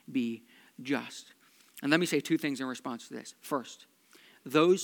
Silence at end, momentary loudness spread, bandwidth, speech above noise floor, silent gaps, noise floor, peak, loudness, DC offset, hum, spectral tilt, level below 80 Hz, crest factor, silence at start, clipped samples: 0 s; 20 LU; 19 kHz; 29 dB; none; -60 dBFS; -8 dBFS; -32 LUFS; under 0.1%; none; -4.5 dB/octave; under -90 dBFS; 24 dB; 0.1 s; under 0.1%